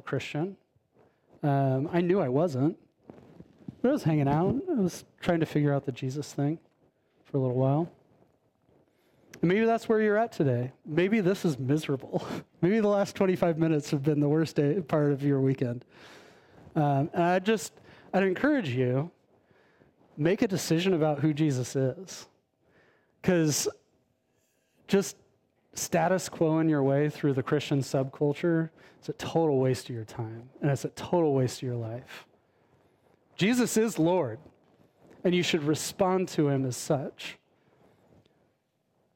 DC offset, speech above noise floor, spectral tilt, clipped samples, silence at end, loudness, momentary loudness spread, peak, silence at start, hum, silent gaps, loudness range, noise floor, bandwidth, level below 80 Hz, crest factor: under 0.1%; 47 dB; -6 dB/octave; under 0.1%; 1.8 s; -28 LUFS; 12 LU; -12 dBFS; 0.05 s; none; none; 4 LU; -74 dBFS; 16.5 kHz; -64 dBFS; 18 dB